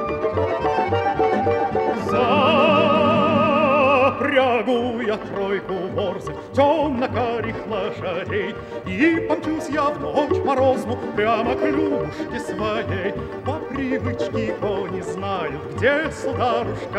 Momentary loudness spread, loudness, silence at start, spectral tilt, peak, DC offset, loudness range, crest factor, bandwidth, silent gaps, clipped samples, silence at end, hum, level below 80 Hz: 10 LU; -21 LUFS; 0 s; -6.5 dB/octave; -4 dBFS; under 0.1%; 7 LU; 16 dB; 12.5 kHz; none; under 0.1%; 0 s; none; -48 dBFS